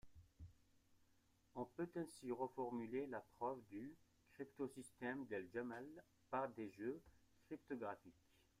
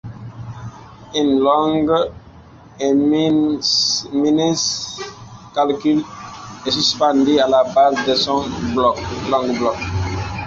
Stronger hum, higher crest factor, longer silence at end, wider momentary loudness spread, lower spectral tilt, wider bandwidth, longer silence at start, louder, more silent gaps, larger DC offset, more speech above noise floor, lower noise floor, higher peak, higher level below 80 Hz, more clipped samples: neither; about the same, 20 dB vs 16 dB; first, 0.5 s vs 0 s; second, 12 LU vs 17 LU; first, -6.5 dB/octave vs -4.5 dB/octave; first, 15.5 kHz vs 7.8 kHz; about the same, 0.05 s vs 0.05 s; second, -50 LUFS vs -17 LUFS; neither; neither; about the same, 28 dB vs 25 dB; first, -78 dBFS vs -42 dBFS; second, -32 dBFS vs -2 dBFS; second, -78 dBFS vs -42 dBFS; neither